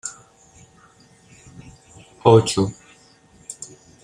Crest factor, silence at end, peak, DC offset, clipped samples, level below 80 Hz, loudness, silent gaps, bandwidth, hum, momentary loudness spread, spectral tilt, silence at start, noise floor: 22 dB; 0.4 s; -2 dBFS; under 0.1%; under 0.1%; -54 dBFS; -17 LUFS; none; 11 kHz; none; 24 LU; -5.5 dB/octave; 0.05 s; -52 dBFS